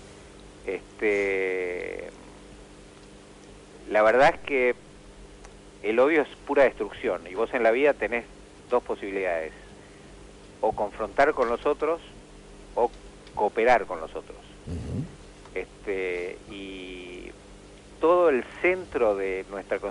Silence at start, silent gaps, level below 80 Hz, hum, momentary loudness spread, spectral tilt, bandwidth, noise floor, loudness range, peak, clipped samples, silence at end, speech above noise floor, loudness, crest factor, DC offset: 0 s; none; -52 dBFS; 50 Hz at -55 dBFS; 19 LU; -5.5 dB/octave; 11 kHz; -48 dBFS; 6 LU; -12 dBFS; under 0.1%; 0 s; 23 dB; -26 LUFS; 16 dB; under 0.1%